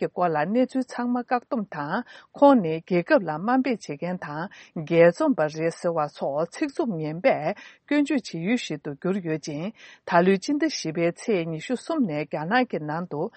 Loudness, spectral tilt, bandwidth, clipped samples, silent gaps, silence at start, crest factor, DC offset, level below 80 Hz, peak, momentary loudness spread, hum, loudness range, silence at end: -25 LUFS; -6 dB/octave; 8.8 kHz; under 0.1%; none; 0 s; 20 dB; under 0.1%; -72 dBFS; -4 dBFS; 12 LU; none; 3 LU; 0.05 s